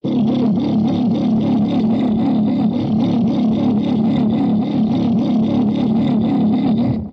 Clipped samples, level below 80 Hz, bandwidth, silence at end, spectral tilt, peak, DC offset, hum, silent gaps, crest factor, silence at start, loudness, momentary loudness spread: under 0.1%; -46 dBFS; 6 kHz; 0 s; -9.5 dB/octave; -8 dBFS; under 0.1%; none; none; 8 dB; 0.05 s; -16 LUFS; 1 LU